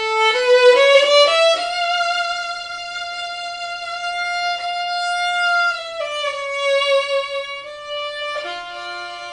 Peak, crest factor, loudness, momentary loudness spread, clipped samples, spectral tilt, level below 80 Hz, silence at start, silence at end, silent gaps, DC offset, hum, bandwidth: -2 dBFS; 18 dB; -18 LUFS; 15 LU; under 0.1%; 1 dB/octave; -60 dBFS; 0 s; 0 s; none; under 0.1%; none; 10.5 kHz